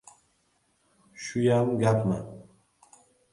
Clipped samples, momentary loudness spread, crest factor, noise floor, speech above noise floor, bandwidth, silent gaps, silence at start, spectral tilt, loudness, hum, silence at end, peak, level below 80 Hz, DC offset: under 0.1%; 19 LU; 20 dB; -70 dBFS; 45 dB; 11.5 kHz; none; 1.2 s; -7 dB/octave; -26 LUFS; none; 0.9 s; -10 dBFS; -60 dBFS; under 0.1%